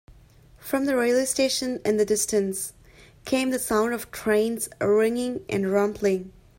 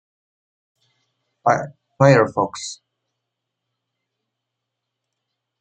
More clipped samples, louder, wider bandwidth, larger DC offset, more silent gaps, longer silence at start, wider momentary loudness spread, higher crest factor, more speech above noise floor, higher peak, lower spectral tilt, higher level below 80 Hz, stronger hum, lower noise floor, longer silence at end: neither; second, -24 LUFS vs -18 LUFS; first, 16.5 kHz vs 9.2 kHz; neither; neither; second, 0.6 s vs 1.45 s; second, 7 LU vs 20 LU; second, 16 dB vs 22 dB; second, 29 dB vs 64 dB; second, -10 dBFS vs -2 dBFS; second, -3.5 dB/octave vs -6 dB/octave; first, -56 dBFS vs -66 dBFS; neither; second, -53 dBFS vs -81 dBFS; second, 0.3 s vs 2.85 s